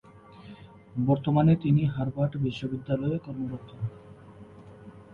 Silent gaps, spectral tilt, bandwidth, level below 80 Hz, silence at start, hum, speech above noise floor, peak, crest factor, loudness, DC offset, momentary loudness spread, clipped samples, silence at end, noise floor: none; -10 dB/octave; 6.6 kHz; -56 dBFS; 0.15 s; none; 22 dB; -12 dBFS; 18 dB; -28 LUFS; under 0.1%; 26 LU; under 0.1%; 0 s; -49 dBFS